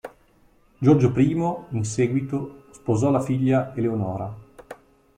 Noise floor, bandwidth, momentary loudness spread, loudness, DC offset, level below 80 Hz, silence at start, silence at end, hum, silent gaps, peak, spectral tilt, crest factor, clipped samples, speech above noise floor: -58 dBFS; 10.5 kHz; 19 LU; -23 LUFS; under 0.1%; -54 dBFS; 0.05 s; 0.45 s; none; none; -4 dBFS; -8 dB/octave; 18 dB; under 0.1%; 36 dB